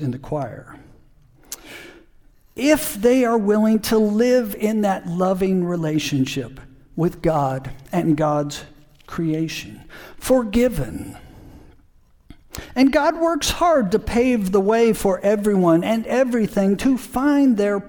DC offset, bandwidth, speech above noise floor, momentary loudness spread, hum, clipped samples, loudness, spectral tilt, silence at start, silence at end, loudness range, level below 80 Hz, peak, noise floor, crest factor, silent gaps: under 0.1%; 19 kHz; 34 dB; 17 LU; none; under 0.1%; -19 LUFS; -6 dB/octave; 0 s; 0 s; 6 LU; -42 dBFS; -2 dBFS; -53 dBFS; 18 dB; none